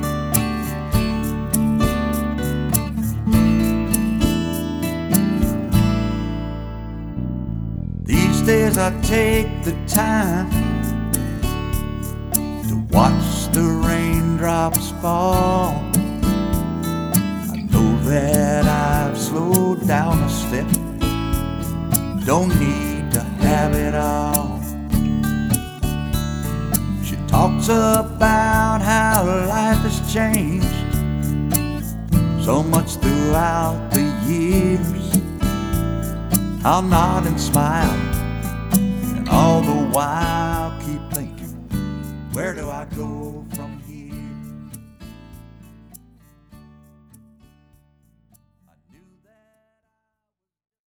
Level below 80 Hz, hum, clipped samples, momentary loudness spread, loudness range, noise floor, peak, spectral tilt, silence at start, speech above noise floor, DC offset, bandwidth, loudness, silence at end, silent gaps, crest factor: -30 dBFS; none; under 0.1%; 11 LU; 5 LU; -84 dBFS; -2 dBFS; -5.5 dB/octave; 0 s; 67 dB; under 0.1%; over 20 kHz; -19 LUFS; 4.45 s; none; 18 dB